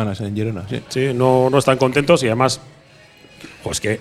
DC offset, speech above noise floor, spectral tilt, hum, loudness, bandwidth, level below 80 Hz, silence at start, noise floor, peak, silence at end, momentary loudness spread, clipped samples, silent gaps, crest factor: under 0.1%; 30 dB; -5.5 dB/octave; none; -18 LUFS; 14.5 kHz; -48 dBFS; 0 s; -47 dBFS; 0 dBFS; 0 s; 11 LU; under 0.1%; none; 18 dB